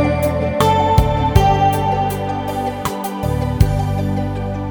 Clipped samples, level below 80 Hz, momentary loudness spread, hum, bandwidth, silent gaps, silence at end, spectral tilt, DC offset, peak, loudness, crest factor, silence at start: under 0.1%; -26 dBFS; 8 LU; none; over 20 kHz; none; 0 s; -6.5 dB/octave; under 0.1%; 0 dBFS; -17 LUFS; 16 dB; 0 s